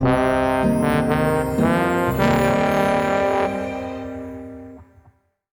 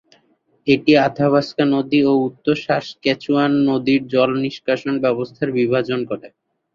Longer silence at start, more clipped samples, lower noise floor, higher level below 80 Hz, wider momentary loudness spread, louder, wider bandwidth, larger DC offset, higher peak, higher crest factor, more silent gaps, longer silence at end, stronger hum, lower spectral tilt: second, 0 s vs 0.65 s; neither; second, -57 dBFS vs -61 dBFS; first, -40 dBFS vs -58 dBFS; first, 14 LU vs 7 LU; about the same, -19 LUFS vs -18 LUFS; first, over 20 kHz vs 7.2 kHz; neither; about the same, -4 dBFS vs -2 dBFS; about the same, 16 dB vs 16 dB; neither; first, 0.7 s vs 0.5 s; neither; about the same, -6.5 dB/octave vs -7 dB/octave